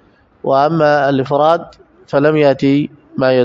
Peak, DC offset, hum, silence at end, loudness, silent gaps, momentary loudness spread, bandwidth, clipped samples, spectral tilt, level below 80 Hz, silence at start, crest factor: 0 dBFS; under 0.1%; none; 0 s; -14 LUFS; none; 7 LU; 7.4 kHz; under 0.1%; -8 dB/octave; -54 dBFS; 0.45 s; 14 dB